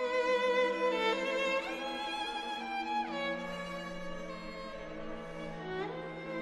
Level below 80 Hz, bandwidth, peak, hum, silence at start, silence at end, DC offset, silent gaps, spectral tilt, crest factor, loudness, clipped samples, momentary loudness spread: -58 dBFS; 12.5 kHz; -20 dBFS; none; 0 s; 0 s; under 0.1%; none; -4 dB/octave; 16 dB; -35 LUFS; under 0.1%; 13 LU